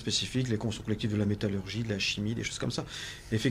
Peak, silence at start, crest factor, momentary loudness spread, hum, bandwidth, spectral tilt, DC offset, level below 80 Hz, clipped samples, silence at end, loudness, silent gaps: -16 dBFS; 0 s; 16 dB; 5 LU; 50 Hz at -50 dBFS; 15 kHz; -4.5 dB/octave; under 0.1%; -52 dBFS; under 0.1%; 0 s; -32 LUFS; none